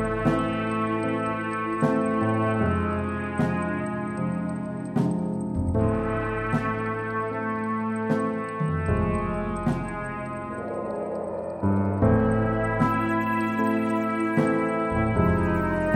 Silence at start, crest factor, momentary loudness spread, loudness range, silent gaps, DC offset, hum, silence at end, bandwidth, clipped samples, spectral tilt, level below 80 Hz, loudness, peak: 0 s; 18 dB; 8 LU; 4 LU; none; under 0.1%; none; 0 s; 10 kHz; under 0.1%; -8 dB/octave; -40 dBFS; -26 LUFS; -8 dBFS